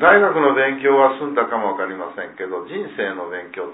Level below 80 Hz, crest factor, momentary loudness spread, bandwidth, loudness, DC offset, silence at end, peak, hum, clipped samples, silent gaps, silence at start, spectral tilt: -62 dBFS; 18 dB; 15 LU; 4 kHz; -19 LUFS; under 0.1%; 0 s; 0 dBFS; none; under 0.1%; none; 0 s; -9 dB/octave